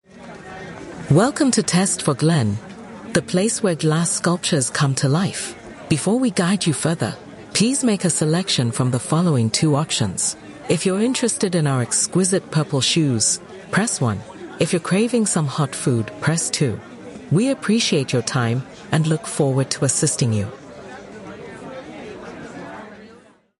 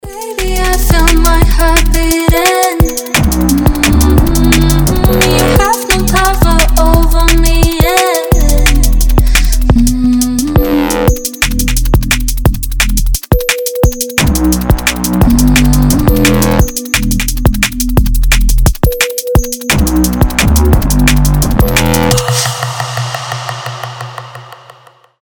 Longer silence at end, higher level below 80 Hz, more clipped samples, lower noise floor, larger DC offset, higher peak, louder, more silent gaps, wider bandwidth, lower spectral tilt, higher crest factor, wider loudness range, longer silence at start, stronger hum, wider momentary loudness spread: second, 0.5 s vs 0.7 s; second, -52 dBFS vs -12 dBFS; second, under 0.1% vs 0.1%; first, -49 dBFS vs -41 dBFS; neither; second, -4 dBFS vs 0 dBFS; second, -19 LUFS vs -10 LUFS; neither; second, 11.5 kHz vs over 20 kHz; about the same, -4.5 dB/octave vs -4.5 dB/octave; first, 16 dB vs 10 dB; about the same, 3 LU vs 3 LU; about the same, 0.15 s vs 0.05 s; neither; first, 18 LU vs 5 LU